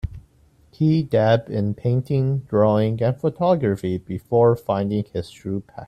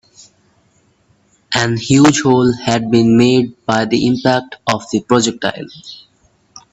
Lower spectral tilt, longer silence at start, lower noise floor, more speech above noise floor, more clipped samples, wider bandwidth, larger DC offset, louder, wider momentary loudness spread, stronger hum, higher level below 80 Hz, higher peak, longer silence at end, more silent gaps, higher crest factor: first, -9 dB/octave vs -5 dB/octave; second, 0.05 s vs 1.5 s; about the same, -55 dBFS vs -56 dBFS; second, 35 dB vs 43 dB; neither; first, 13 kHz vs 8.6 kHz; neither; second, -21 LUFS vs -14 LUFS; about the same, 11 LU vs 11 LU; neither; about the same, -46 dBFS vs -50 dBFS; second, -6 dBFS vs 0 dBFS; second, 0 s vs 0.75 s; neither; about the same, 16 dB vs 16 dB